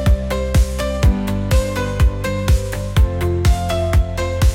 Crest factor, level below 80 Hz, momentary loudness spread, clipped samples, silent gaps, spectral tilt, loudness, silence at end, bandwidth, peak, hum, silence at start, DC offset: 12 dB; -18 dBFS; 3 LU; under 0.1%; none; -6 dB/octave; -18 LUFS; 0 s; 16.5 kHz; -4 dBFS; none; 0 s; under 0.1%